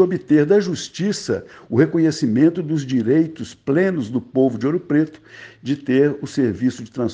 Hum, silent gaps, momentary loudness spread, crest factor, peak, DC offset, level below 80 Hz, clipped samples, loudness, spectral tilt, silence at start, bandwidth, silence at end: none; none; 9 LU; 18 dB; -2 dBFS; under 0.1%; -62 dBFS; under 0.1%; -19 LUFS; -6.5 dB/octave; 0 s; 9.4 kHz; 0 s